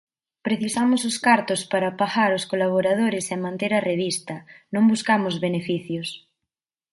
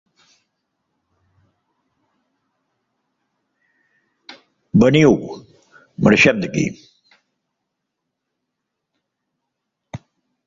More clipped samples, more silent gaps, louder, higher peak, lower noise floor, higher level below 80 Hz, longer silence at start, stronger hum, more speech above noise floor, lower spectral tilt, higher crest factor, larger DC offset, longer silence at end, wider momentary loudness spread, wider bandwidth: neither; neither; second, -22 LUFS vs -15 LUFS; second, -4 dBFS vs 0 dBFS; first, -86 dBFS vs -78 dBFS; second, -68 dBFS vs -54 dBFS; second, 0.45 s vs 4.3 s; neither; about the same, 63 dB vs 64 dB; second, -4.5 dB/octave vs -6 dB/octave; about the same, 20 dB vs 22 dB; neither; first, 0.75 s vs 0.5 s; second, 11 LU vs 26 LU; first, 11.5 kHz vs 7.6 kHz